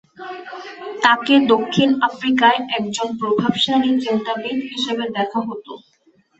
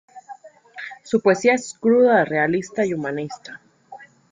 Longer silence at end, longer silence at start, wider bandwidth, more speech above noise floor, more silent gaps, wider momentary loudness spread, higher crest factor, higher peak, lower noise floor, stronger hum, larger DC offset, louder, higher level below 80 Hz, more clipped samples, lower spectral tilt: first, 0.6 s vs 0.3 s; about the same, 0.2 s vs 0.15 s; second, 8.2 kHz vs 9.4 kHz; first, 40 dB vs 25 dB; neither; second, 18 LU vs 21 LU; about the same, 18 dB vs 18 dB; about the same, -2 dBFS vs -2 dBFS; first, -58 dBFS vs -44 dBFS; neither; neither; about the same, -18 LUFS vs -19 LUFS; about the same, -62 dBFS vs -66 dBFS; neither; about the same, -4.5 dB/octave vs -5.5 dB/octave